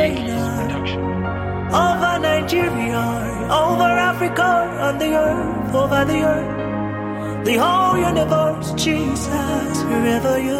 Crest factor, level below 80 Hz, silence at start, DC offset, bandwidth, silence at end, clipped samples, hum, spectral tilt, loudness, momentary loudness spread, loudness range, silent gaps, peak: 14 dB; -38 dBFS; 0 s; under 0.1%; 16.5 kHz; 0 s; under 0.1%; none; -5.5 dB/octave; -19 LUFS; 7 LU; 2 LU; none; -4 dBFS